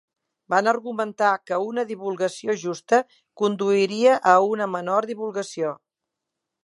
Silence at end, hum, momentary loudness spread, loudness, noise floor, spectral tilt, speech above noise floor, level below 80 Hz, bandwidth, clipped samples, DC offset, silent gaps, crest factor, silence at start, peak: 0.9 s; none; 11 LU; -22 LUFS; -84 dBFS; -4.5 dB/octave; 62 dB; -80 dBFS; 11.5 kHz; under 0.1%; under 0.1%; none; 20 dB; 0.5 s; -2 dBFS